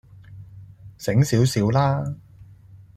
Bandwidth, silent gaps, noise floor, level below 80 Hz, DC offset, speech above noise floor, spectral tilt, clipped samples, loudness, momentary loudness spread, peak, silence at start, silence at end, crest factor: 14.5 kHz; none; -47 dBFS; -50 dBFS; under 0.1%; 27 dB; -6.5 dB/octave; under 0.1%; -21 LUFS; 21 LU; -6 dBFS; 0.3 s; 0.2 s; 16 dB